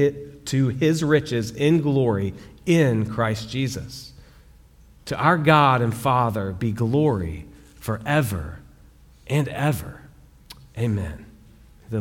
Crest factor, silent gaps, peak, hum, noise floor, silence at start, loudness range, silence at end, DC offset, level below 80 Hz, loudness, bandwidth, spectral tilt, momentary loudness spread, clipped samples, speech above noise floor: 20 dB; none; -2 dBFS; none; -50 dBFS; 0 s; 6 LU; 0 s; under 0.1%; -46 dBFS; -22 LUFS; 17 kHz; -6.5 dB/octave; 16 LU; under 0.1%; 29 dB